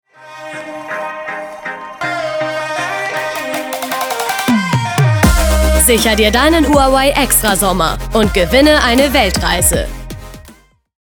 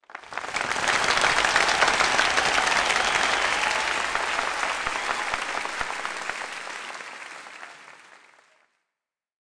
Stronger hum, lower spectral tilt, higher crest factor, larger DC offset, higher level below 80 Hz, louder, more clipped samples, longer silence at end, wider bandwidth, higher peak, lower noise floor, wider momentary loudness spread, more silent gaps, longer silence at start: neither; first, -4 dB/octave vs -0.5 dB/octave; about the same, 14 dB vs 18 dB; neither; first, -22 dBFS vs -52 dBFS; first, -13 LUFS vs -23 LUFS; neither; second, 0.55 s vs 1.55 s; first, over 20 kHz vs 10.5 kHz; first, 0 dBFS vs -8 dBFS; second, -44 dBFS vs -87 dBFS; about the same, 15 LU vs 17 LU; neither; about the same, 0.2 s vs 0.1 s